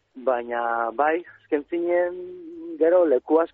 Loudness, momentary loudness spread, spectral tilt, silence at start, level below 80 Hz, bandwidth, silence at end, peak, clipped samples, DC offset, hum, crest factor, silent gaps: -23 LUFS; 16 LU; -3 dB/octave; 0.15 s; -68 dBFS; 4 kHz; 0.1 s; -8 dBFS; under 0.1%; under 0.1%; none; 14 dB; none